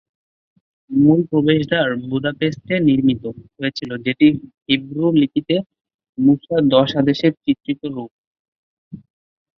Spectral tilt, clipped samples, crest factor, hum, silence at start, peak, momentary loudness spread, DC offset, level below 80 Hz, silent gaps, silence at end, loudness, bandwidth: -8 dB/octave; under 0.1%; 18 dB; none; 0.9 s; -2 dBFS; 11 LU; under 0.1%; -56 dBFS; 5.66-5.70 s, 5.94-5.99 s, 6.09-6.13 s, 8.11-8.91 s; 0.6 s; -18 LUFS; 6.4 kHz